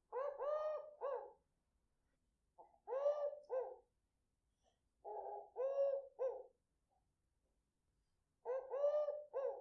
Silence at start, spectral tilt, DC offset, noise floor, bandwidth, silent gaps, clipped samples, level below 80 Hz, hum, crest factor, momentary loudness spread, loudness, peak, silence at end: 0.1 s; -1.5 dB/octave; under 0.1%; -87 dBFS; 6.2 kHz; none; under 0.1%; -86 dBFS; none; 18 dB; 14 LU; -44 LUFS; -28 dBFS; 0 s